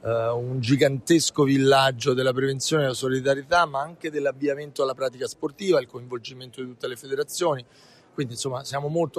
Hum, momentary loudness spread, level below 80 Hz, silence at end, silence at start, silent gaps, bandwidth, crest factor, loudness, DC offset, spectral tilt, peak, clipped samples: none; 14 LU; -62 dBFS; 0 s; 0.05 s; none; 14 kHz; 18 dB; -24 LUFS; under 0.1%; -4.5 dB/octave; -8 dBFS; under 0.1%